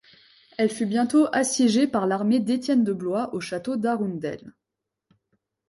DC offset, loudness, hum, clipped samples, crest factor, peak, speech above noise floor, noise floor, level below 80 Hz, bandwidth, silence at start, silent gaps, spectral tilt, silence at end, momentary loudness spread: under 0.1%; -24 LUFS; none; under 0.1%; 14 dB; -10 dBFS; 62 dB; -85 dBFS; -68 dBFS; 11.5 kHz; 0.6 s; none; -5 dB/octave; 1.2 s; 10 LU